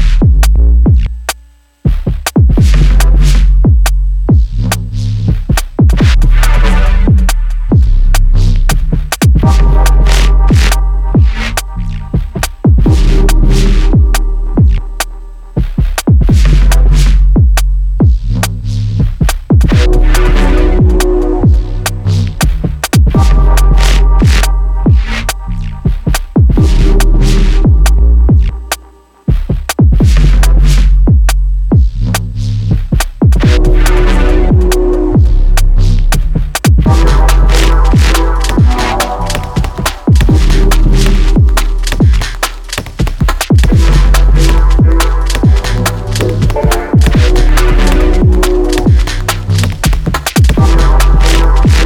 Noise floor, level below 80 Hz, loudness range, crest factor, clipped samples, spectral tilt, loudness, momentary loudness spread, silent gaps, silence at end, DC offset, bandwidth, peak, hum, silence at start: -39 dBFS; -8 dBFS; 1 LU; 8 dB; under 0.1%; -5.5 dB/octave; -11 LUFS; 7 LU; none; 0 s; under 0.1%; 16 kHz; 0 dBFS; none; 0 s